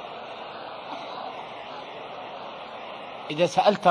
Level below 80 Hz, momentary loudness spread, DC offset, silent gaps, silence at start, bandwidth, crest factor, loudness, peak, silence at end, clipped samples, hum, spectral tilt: -70 dBFS; 17 LU; under 0.1%; none; 0 s; 10.5 kHz; 22 dB; -30 LUFS; -6 dBFS; 0 s; under 0.1%; none; -4.5 dB/octave